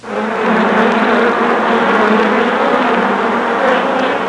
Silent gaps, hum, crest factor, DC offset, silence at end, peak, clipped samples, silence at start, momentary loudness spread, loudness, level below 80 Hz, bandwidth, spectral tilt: none; none; 10 dB; 0.1%; 0 s; -2 dBFS; under 0.1%; 0.05 s; 3 LU; -12 LUFS; -54 dBFS; 11 kHz; -5.5 dB/octave